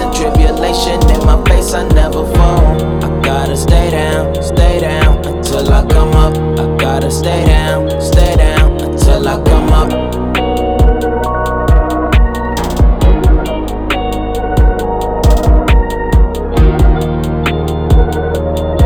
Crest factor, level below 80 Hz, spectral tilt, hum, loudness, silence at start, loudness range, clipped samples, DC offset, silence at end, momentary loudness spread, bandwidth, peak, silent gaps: 10 dB; -12 dBFS; -6 dB/octave; none; -12 LUFS; 0 s; 2 LU; 0.3%; under 0.1%; 0 s; 5 LU; 15.5 kHz; 0 dBFS; none